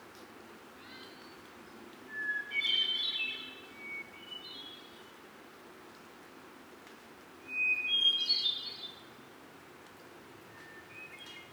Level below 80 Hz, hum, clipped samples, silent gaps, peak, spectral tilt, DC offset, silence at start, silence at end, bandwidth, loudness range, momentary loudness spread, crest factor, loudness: -80 dBFS; none; under 0.1%; none; -18 dBFS; -1 dB/octave; under 0.1%; 0 s; 0 s; over 20 kHz; 16 LU; 25 LU; 20 dB; -31 LUFS